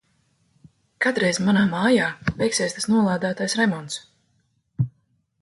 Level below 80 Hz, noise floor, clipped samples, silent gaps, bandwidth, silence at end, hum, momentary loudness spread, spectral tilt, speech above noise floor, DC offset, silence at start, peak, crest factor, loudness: -54 dBFS; -68 dBFS; under 0.1%; none; 11.5 kHz; 0.5 s; none; 10 LU; -4.5 dB/octave; 46 dB; under 0.1%; 1 s; -6 dBFS; 18 dB; -22 LUFS